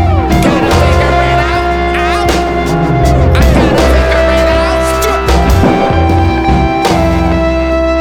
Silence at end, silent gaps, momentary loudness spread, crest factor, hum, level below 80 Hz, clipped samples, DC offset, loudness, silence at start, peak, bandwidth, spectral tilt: 0 s; none; 3 LU; 8 dB; none; -14 dBFS; under 0.1%; under 0.1%; -10 LUFS; 0 s; 0 dBFS; 17 kHz; -6 dB/octave